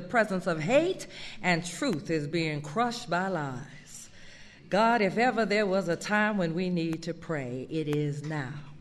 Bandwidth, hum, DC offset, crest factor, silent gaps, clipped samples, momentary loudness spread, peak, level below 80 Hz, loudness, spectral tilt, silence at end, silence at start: 13 kHz; none; under 0.1%; 18 dB; none; under 0.1%; 12 LU; -12 dBFS; -58 dBFS; -29 LUFS; -5.5 dB/octave; 0 s; 0 s